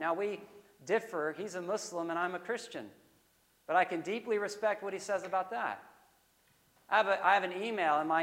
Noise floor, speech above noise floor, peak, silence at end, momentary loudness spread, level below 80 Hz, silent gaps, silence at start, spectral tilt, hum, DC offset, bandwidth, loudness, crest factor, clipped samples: -70 dBFS; 37 dB; -14 dBFS; 0 s; 14 LU; -84 dBFS; none; 0 s; -3.5 dB/octave; none; under 0.1%; 16 kHz; -33 LUFS; 22 dB; under 0.1%